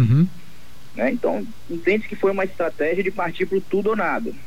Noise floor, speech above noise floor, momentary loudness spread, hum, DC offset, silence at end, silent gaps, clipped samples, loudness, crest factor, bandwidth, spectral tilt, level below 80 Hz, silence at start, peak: -47 dBFS; 25 dB; 4 LU; none; 3%; 0.05 s; none; under 0.1%; -22 LUFS; 14 dB; 16 kHz; -8.5 dB/octave; -52 dBFS; 0 s; -8 dBFS